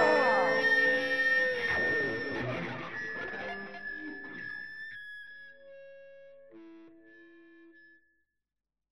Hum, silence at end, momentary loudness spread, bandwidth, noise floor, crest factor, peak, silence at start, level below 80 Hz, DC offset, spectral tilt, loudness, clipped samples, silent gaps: none; 0.95 s; 20 LU; 12.5 kHz; -90 dBFS; 20 dB; -14 dBFS; 0 s; -66 dBFS; 0.2%; -4.5 dB/octave; -30 LUFS; under 0.1%; none